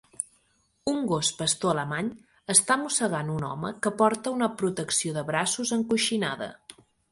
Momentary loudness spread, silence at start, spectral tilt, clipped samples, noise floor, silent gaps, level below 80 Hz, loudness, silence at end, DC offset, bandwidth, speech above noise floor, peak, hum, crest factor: 13 LU; 0.2 s; -3 dB/octave; under 0.1%; -68 dBFS; none; -64 dBFS; -26 LUFS; 0.4 s; under 0.1%; 11.5 kHz; 42 dB; -4 dBFS; none; 24 dB